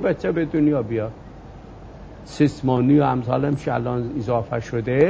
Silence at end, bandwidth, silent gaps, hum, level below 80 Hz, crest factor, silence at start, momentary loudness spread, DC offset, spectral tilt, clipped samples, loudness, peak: 0 s; 8 kHz; none; none; -44 dBFS; 16 dB; 0 s; 24 LU; under 0.1%; -8.5 dB/octave; under 0.1%; -21 LUFS; -4 dBFS